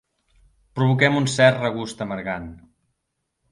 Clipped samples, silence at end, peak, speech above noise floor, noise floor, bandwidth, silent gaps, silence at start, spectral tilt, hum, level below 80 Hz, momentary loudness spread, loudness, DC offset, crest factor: under 0.1%; 0.95 s; -2 dBFS; 57 dB; -77 dBFS; 11.5 kHz; none; 0.75 s; -5.5 dB/octave; none; -54 dBFS; 15 LU; -21 LUFS; under 0.1%; 22 dB